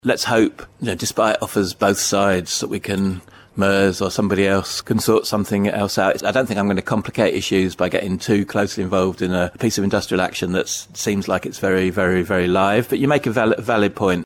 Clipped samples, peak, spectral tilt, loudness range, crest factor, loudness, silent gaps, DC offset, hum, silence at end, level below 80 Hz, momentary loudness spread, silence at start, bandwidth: under 0.1%; -4 dBFS; -4.5 dB/octave; 2 LU; 14 dB; -19 LUFS; none; under 0.1%; none; 0 s; -50 dBFS; 5 LU; 0.05 s; 17.5 kHz